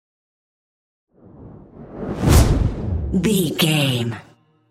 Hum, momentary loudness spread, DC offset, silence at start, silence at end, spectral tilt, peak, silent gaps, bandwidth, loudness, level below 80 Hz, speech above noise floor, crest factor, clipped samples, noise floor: none; 16 LU; under 0.1%; 1.4 s; 0.5 s; -5 dB/octave; -2 dBFS; none; 16 kHz; -19 LUFS; -28 dBFS; 23 dB; 20 dB; under 0.1%; -42 dBFS